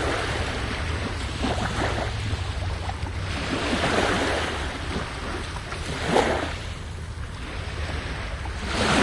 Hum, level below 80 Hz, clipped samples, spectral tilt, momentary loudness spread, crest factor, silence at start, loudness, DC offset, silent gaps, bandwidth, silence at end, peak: none; -34 dBFS; under 0.1%; -4.5 dB/octave; 11 LU; 22 dB; 0 s; -27 LUFS; under 0.1%; none; 11.5 kHz; 0 s; -4 dBFS